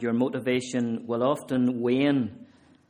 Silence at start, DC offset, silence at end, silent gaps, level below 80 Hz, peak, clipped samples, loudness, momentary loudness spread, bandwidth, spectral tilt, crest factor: 0 s; under 0.1%; 0.45 s; none; -68 dBFS; -10 dBFS; under 0.1%; -26 LUFS; 5 LU; 12 kHz; -6 dB/octave; 16 dB